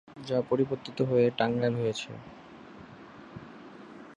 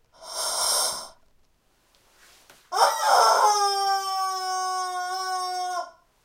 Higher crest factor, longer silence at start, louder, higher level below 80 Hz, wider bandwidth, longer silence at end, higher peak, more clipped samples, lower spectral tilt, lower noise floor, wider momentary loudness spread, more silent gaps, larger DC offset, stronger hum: about the same, 20 dB vs 22 dB; about the same, 0.1 s vs 0.2 s; second, -29 LUFS vs -23 LUFS; about the same, -66 dBFS vs -68 dBFS; second, 10 kHz vs 16 kHz; second, 0 s vs 0.35 s; second, -10 dBFS vs -4 dBFS; neither; first, -6.5 dB/octave vs 1.5 dB/octave; second, -49 dBFS vs -65 dBFS; first, 23 LU vs 14 LU; neither; neither; neither